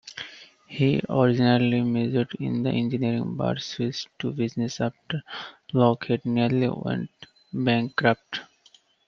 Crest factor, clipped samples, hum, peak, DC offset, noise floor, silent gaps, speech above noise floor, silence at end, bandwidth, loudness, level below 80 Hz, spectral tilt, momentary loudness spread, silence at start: 20 dB; under 0.1%; none; -4 dBFS; under 0.1%; -59 dBFS; none; 35 dB; 0.65 s; 7.2 kHz; -25 LUFS; -60 dBFS; -7 dB/octave; 14 LU; 0.05 s